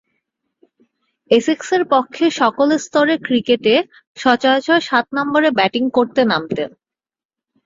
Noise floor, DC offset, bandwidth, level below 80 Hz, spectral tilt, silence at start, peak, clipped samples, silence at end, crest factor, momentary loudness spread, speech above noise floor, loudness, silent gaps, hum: -73 dBFS; under 0.1%; 7.8 kHz; -62 dBFS; -4 dB/octave; 1.3 s; 0 dBFS; under 0.1%; 1 s; 16 dB; 5 LU; 57 dB; -16 LUFS; 4.07-4.15 s; none